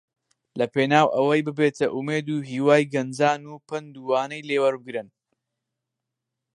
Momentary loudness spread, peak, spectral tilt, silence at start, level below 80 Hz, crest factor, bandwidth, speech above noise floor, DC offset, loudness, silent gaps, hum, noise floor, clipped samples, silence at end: 15 LU; -2 dBFS; -6 dB/octave; 0.55 s; -74 dBFS; 22 dB; 11 kHz; 61 dB; under 0.1%; -23 LUFS; none; none; -84 dBFS; under 0.1%; 1.5 s